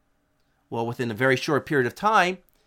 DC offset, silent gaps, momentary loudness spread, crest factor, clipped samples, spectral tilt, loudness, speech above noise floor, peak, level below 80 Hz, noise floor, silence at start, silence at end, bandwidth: under 0.1%; none; 10 LU; 20 dB; under 0.1%; -5 dB/octave; -23 LUFS; 45 dB; -6 dBFS; -64 dBFS; -68 dBFS; 0.7 s; 0.3 s; 16.5 kHz